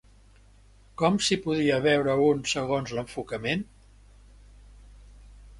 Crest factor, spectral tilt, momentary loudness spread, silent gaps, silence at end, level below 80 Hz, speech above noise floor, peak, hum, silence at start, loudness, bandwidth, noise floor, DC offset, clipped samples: 20 dB; -4.5 dB/octave; 11 LU; none; 0 s; -52 dBFS; 30 dB; -8 dBFS; 50 Hz at -50 dBFS; 1 s; -26 LUFS; 11.5 kHz; -55 dBFS; under 0.1%; under 0.1%